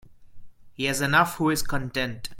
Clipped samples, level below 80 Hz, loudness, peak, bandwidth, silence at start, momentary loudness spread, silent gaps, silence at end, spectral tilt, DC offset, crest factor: under 0.1%; -46 dBFS; -24 LUFS; -6 dBFS; 17 kHz; 0.05 s; 8 LU; none; 0 s; -4 dB/octave; under 0.1%; 20 dB